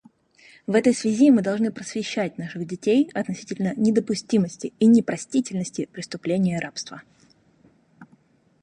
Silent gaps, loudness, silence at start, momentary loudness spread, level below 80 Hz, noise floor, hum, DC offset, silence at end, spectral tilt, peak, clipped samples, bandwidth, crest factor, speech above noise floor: none; -23 LUFS; 0.7 s; 14 LU; -66 dBFS; -59 dBFS; none; under 0.1%; 0.6 s; -6 dB/octave; -6 dBFS; under 0.1%; 10.5 kHz; 18 dB; 37 dB